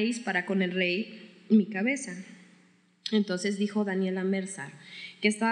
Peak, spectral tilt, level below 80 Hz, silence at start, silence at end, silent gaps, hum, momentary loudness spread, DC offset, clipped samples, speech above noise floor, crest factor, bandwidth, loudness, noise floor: -12 dBFS; -5 dB/octave; under -90 dBFS; 0 s; 0 s; none; none; 17 LU; under 0.1%; under 0.1%; 34 dB; 18 dB; 11 kHz; -29 LUFS; -62 dBFS